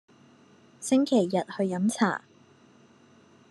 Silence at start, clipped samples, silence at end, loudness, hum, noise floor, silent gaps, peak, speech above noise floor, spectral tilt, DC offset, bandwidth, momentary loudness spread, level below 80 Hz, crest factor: 0.8 s; under 0.1%; 1.3 s; -27 LUFS; none; -57 dBFS; none; -8 dBFS; 32 dB; -5.5 dB/octave; under 0.1%; 12.5 kHz; 10 LU; -80 dBFS; 20 dB